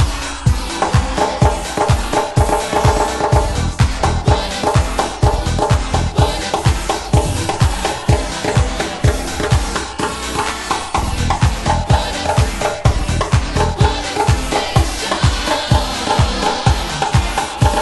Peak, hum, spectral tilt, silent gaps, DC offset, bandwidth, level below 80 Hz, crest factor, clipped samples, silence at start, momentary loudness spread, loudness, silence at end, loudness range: 0 dBFS; none; -5 dB/octave; none; under 0.1%; 12 kHz; -22 dBFS; 16 dB; under 0.1%; 0 s; 4 LU; -17 LUFS; 0 s; 2 LU